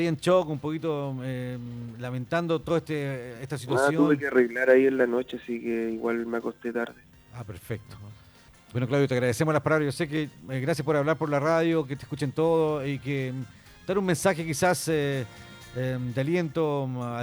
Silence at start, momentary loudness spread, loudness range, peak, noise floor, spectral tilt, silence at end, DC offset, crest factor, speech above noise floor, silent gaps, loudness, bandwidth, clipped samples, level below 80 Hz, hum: 0 s; 14 LU; 6 LU; -8 dBFS; -54 dBFS; -6 dB/octave; 0 s; under 0.1%; 20 dB; 27 dB; none; -27 LUFS; over 20 kHz; under 0.1%; -60 dBFS; none